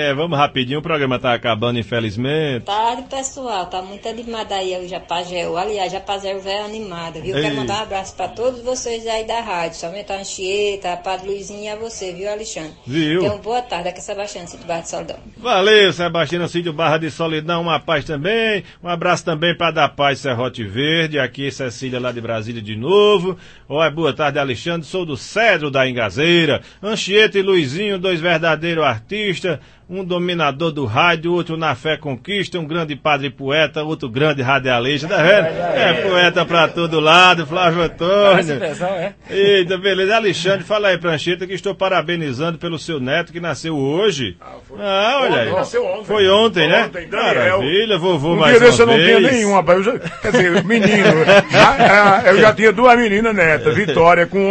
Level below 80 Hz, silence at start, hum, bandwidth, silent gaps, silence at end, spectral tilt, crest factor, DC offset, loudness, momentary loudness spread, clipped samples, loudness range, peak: -46 dBFS; 0 s; none; 8.8 kHz; none; 0 s; -4.5 dB/octave; 16 dB; under 0.1%; -16 LUFS; 14 LU; under 0.1%; 11 LU; 0 dBFS